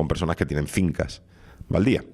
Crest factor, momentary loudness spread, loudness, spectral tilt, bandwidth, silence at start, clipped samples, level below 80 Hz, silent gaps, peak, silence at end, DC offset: 18 dB; 10 LU; -25 LUFS; -6.5 dB/octave; 14 kHz; 0 s; under 0.1%; -40 dBFS; none; -6 dBFS; 0 s; under 0.1%